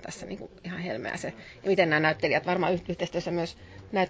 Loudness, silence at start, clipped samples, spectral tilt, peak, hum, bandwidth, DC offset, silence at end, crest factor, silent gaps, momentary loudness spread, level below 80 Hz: -28 LUFS; 0 s; under 0.1%; -5.5 dB/octave; -8 dBFS; none; 8 kHz; under 0.1%; 0 s; 22 dB; none; 16 LU; -56 dBFS